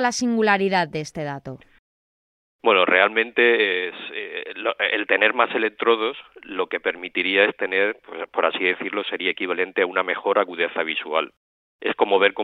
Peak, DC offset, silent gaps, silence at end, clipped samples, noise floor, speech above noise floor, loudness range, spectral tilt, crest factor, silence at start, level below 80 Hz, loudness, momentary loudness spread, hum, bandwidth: 0 dBFS; under 0.1%; 1.79-2.59 s, 11.37-11.79 s; 0 s; under 0.1%; under -90 dBFS; over 68 dB; 3 LU; -3.5 dB/octave; 22 dB; 0 s; -68 dBFS; -21 LUFS; 13 LU; none; 10.5 kHz